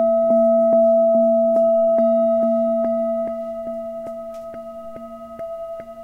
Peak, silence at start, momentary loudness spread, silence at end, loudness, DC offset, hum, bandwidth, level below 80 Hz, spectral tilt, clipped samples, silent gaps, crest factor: -8 dBFS; 0 s; 19 LU; 0 s; -17 LUFS; 0.2%; none; 3 kHz; -56 dBFS; -9 dB/octave; under 0.1%; none; 10 dB